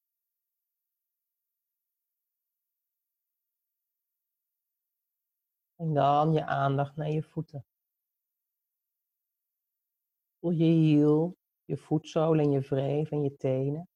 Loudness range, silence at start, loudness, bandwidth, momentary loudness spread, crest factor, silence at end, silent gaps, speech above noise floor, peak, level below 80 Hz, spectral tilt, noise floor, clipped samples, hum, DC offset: 13 LU; 5.8 s; -27 LUFS; 7 kHz; 15 LU; 18 dB; 0.1 s; none; 61 dB; -12 dBFS; -70 dBFS; -9 dB/octave; -88 dBFS; under 0.1%; none; under 0.1%